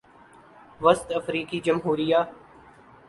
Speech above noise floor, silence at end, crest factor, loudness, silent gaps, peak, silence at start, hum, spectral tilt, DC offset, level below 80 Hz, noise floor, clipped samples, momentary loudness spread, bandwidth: 29 dB; 0.75 s; 22 dB; -24 LUFS; none; -4 dBFS; 0.8 s; none; -5.5 dB/octave; under 0.1%; -60 dBFS; -52 dBFS; under 0.1%; 7 LU; 11.5 kHz